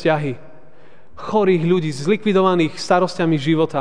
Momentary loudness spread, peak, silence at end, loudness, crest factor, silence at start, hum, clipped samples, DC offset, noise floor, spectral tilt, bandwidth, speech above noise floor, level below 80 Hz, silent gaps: 7 LU; -2 dBFS; 0 s; -18 LUFS; 16 dB; 0 s; none; under 0.1%; 2%; -49 dBFS; -6.5 dB/octave; 10 kHz; 32 dB; -58 dBFS; none